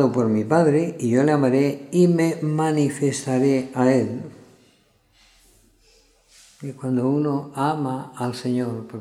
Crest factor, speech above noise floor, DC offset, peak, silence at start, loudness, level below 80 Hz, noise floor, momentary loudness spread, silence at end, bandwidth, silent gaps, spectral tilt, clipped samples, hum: 18 dB; 39 dB; under 0.1%; -4 dBFS; 0 s; -21 LUFS; -66 dBFS; -60 dBFS; 11 LU; 0 s; 13 kHz; none; -7 dB/octave; under 0.1%; none